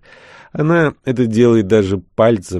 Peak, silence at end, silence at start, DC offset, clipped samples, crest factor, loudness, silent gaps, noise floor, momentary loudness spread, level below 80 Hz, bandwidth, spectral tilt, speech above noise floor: -2 dBFS; 0 s; 0.55 s; under 0.1%; under 0.1%; 14 dB; -15 LUFS; none; -42 dBFS; 8 LU; -48 dBFS; 11.5 kHz; -7.5 dB/octave; 28 dB